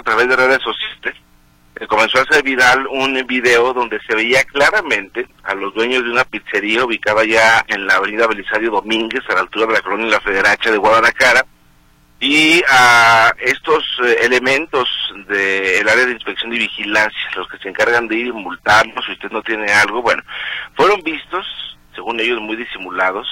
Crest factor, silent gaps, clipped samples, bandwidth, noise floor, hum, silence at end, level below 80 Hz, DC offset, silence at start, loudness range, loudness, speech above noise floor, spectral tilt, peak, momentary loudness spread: 16 dB; none; under 0.1%; 16.5 kHz; -50 dBFS; none; 0 s; -48 dBFS; under 0.1%; 0.05 s; 5 LU; -14 LUFS; 35 dB; -2.5 dB/octave; 0 dBFS; 13 LU